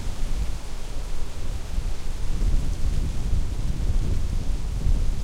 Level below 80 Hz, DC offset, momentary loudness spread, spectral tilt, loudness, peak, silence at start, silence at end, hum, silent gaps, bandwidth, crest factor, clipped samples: -24 dBFS; under 0.1%; 8 LU; -6 dB/octave; -30 LUFS; -10 dBFS; 0 s; 0 s; none; none; 11 kHz; 12 dB; under 0.1%